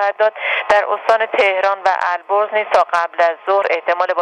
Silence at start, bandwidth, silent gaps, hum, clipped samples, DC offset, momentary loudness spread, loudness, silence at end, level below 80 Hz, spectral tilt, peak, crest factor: 0 s; 10.5 kHz; none; none; under 0.1%; under 0.1%; 3 LU; -16 LUFS; 0 s; -60 dBFS; -2 dB/octave; 0 dBFS; 16 dB